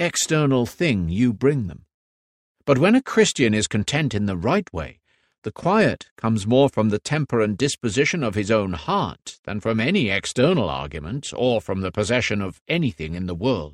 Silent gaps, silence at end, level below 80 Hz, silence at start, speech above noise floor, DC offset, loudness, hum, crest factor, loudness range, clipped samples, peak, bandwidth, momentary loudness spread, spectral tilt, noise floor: 1.94-2.55 s, 5.38-5.42 s, 6.11-6.16 s, 9.39-9.43 s, 12.61-12.66 s; 0 s; -46 dBFS; 0 s; over 69 dB; under 0.1%; -21 LUFS; none; 18 dB; 2 LU; under 0.1%; -4 dBFS; 15 kHz; 11 LU; -5 dB/octave; under -90 dBFS